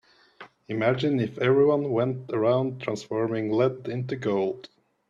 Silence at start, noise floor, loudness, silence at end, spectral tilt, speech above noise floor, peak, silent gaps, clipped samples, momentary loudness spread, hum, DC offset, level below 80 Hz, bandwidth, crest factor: 0.4 s; -50 dBFS; -26 LUFS; 0.45 s; -7.5 dB/octave; 26 dB; -8 dBFS; none; under 0.1%; 10 LU; none; under 0.1%; -66 dBFS; 7.6 kHz; 18 dB